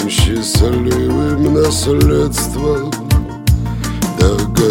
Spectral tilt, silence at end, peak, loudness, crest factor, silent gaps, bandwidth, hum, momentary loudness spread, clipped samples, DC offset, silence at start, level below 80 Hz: -5.5 dB/octave; 0 s; 0 dBFS; -14 LUFS; 14 dB; none; 17 kHz; none; 5 LU; under 0.1%; under 0.1%; 0 s; -20 dBFS